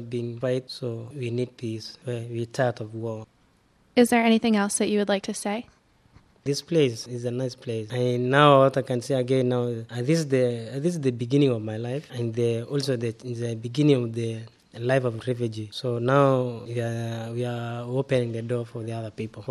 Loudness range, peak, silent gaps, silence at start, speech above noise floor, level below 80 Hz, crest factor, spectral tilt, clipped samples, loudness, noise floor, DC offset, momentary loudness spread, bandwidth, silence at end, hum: 6 LU; -2 dBFS; none; 0 s; 37 dB; -66 dBFS; 22 dB; -6 dB/octave; under 0.1%; -25 LUFS; -62 dBFS; under 0.1%; 13 LU; 13 kHz; 0 s; none